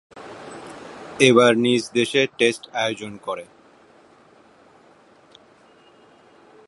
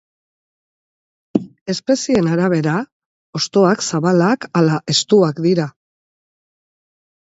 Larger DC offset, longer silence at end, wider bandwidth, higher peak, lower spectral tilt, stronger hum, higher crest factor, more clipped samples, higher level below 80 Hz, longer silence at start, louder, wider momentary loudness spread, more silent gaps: neither; first, 3.25 s vs 1.5 s; first, 11.5 kHz vs 8 kHz; about the same, 0 dBFS vs 0 dBFS; second, -4 dB/octave vs -5.5 dB/octave; neither; about the same, 22 dB vs 18 dB; neither; second, -68 dBFS vs -58 dBFS; second, 0.15 s vs 1.35 s; about the same, -19 LUFS vs -17 LUFS; first, 24 LU vs 9 LU; second, none vs 1.61-1.66 s, 2.92-3.33 s